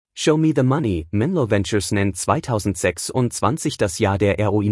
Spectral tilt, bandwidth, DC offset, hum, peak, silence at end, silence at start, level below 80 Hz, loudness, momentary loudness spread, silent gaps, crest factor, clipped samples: -5.5 dB/octave; 12 kHz; under 0.1%; none; -4 dBFS; 0 s; 0.15 s; -48 dBFS; -20 LUFS; 4 LU; none; 16 dB; under 0.1%